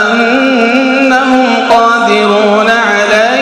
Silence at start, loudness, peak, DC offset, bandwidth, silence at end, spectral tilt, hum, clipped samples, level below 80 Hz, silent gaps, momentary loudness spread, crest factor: 0 s; -8 LUFS; 0 dBFS; under 0.1%; 11.5 kHz; 0 s; -4 dB/octave; none; 2%; -50 dBFS; none; 1 LU; 8 dB